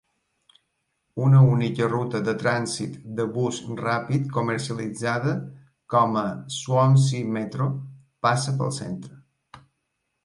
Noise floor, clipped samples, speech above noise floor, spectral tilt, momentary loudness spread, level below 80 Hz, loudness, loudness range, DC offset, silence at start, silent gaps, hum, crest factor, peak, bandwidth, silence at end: -77 dBFS; under 0.1%; 54 dB; -6.5 dB/octave; 13 LU; -62 dBFS; -24 LUFS; 4 LU; under 0.1%; 1.15 s; none; none; 18 dB; -6 dBFS; 11.5 kHz; 0.65 s